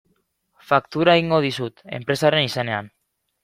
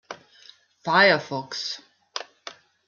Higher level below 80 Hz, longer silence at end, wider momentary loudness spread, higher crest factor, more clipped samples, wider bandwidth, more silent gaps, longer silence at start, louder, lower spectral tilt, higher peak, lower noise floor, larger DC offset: first, -58 dBFS vs -76 dBFS; first, 0.55 s vs 0.35 s; second, 12 LU vs 25 LU; about the same, 20 dB vs 22 dB; neither; first, 16 kHz vs 7.2 kHz; neither; first, 0.7 s vs 0.1 s; about the same, -20 LUFS vs -21 LUFS; first, -5.5 dB/octave vs -3.5 dB/octave; about the same, -2 dBFS vs -4 dBFS; first, -68 dBFS vs -53 dBFS; neither